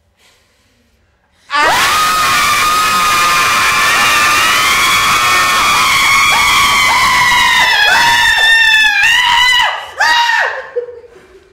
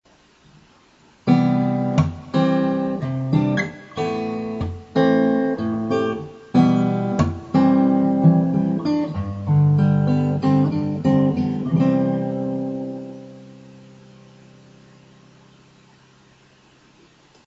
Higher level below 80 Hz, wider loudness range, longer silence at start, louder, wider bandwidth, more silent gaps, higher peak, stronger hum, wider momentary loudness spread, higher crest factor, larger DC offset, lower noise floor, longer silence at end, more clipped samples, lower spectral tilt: first, -40 dBFS vs -54 dBFS; second, 3 LU vs 7 LU; first, 1.5 s vs 1.25 s; first, -8 LUFS vs -20 LUFS; first, 18 kHz vs 7.6 kHz; neither; first, 0 dBFS vs -4 dBFS; neither; second, 4 LU vs 11 LU; second, 10 dB vs 18 dB; neither; about the same, -55 dBFS vs -54 dBFS; second, 0.45 s vs 3.75 s; neither; second, 0 dB/octave vs -9 dB/octave